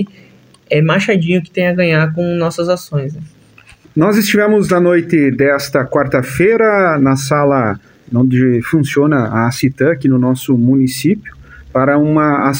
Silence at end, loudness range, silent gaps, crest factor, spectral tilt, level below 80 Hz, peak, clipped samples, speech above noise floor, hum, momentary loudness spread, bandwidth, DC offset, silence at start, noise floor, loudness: 0 s; 3 LU; none; 12 dB; -6.5 dB/octave; -46 dBFS; 0 dBFS; under 0.1%; 31 dB; none; 6 LU; 16.5 kHz; under 0.1%; 0 s; -43 dBFS; -13 LUFS